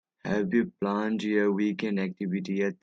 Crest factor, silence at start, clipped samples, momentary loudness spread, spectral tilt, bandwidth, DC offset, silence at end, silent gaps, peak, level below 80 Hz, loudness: 16 dB; 0.25 s; under 0.1%; 5 LU; -7.5 dB/octave; 7.6 kHz; under 0.1%; 0.1 s; none; -12 dBFS; -68 dBFS; -28 LUFS